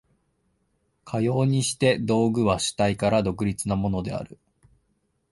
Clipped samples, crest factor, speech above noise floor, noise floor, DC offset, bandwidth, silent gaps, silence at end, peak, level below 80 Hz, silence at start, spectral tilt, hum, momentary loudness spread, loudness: under 0.1%; 18 dB; 48 dB; -71 dBFS; under 0.1%; 12 kHz; none; 1.05 s; -6 dBFS; -48 dBFS; 1.05 s; -5.5 dB/octave; none; 10 LU; -24 LUFS